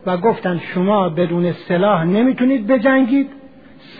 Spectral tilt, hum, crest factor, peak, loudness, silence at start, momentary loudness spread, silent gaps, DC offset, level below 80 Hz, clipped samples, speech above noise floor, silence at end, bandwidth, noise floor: -10.5 dB/octave; none; 14 dB; -2 dBFS; -16 LUFS; 0.05 s; 6 LU; none; 0.4%; -60 dBFS; under 0.1%; 26 dB; 0 s; 4.9 kHz; -42 dBFS